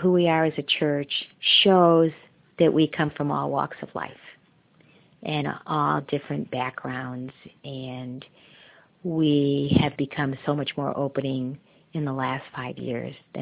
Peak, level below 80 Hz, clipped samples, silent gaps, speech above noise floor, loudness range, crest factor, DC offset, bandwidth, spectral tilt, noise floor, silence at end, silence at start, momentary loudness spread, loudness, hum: -4 dBFS; -58 dBFS; under 0.1%; none; 35 dB; 9 LU; 22 dB; under 0.1%; 4 kHz; -10 dB/octave; -59 dBFS; 0 s; 0 s; 17 LU; -24 LUFS; none